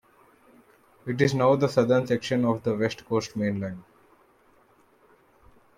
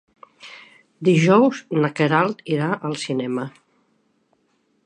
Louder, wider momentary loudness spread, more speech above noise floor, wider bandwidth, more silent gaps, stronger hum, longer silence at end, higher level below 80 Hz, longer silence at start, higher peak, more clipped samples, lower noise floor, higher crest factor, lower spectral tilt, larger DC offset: second, -25 LUFS vs -20 LUFS; second, 13 LU vs 20 LU; second, 36 dB vs 47 dB; first, 14.5 kHz vs 10 kHz; neither; neither; first, 1.95 s vs 1.35 s; first, -64 dBFS vs -72 dBFS; first, 1.05 s vs 0.45 s; second, -8 dBFS vs -2 dBFS; neither; second, -60 dBFS vs -66 dBFS; about the same, 20 dB vs 20 dB; about the same, -6.5 dB/octave vs -6.5 dB/octave; neither